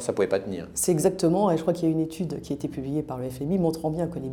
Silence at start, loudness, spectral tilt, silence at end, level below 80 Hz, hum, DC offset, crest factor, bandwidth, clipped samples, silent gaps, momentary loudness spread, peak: 0 s; -26 LUFS; -6 dB/octave; 0 s; -52 dBFS; none; under 0.1%; 16 dB; 19.5 kHz; under 0.1%; none; 9 LU; -10 dBFS